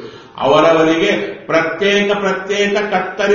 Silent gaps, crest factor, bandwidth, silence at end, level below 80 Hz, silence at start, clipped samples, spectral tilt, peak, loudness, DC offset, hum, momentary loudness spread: none; 14 dB; 7.2 kHz; 0 s; -50 dBFS; 0 s; under 0.1%; -2.5 dB/octave; 0 dBFS; -14 LUFS; under 0.1%; none; 7 LU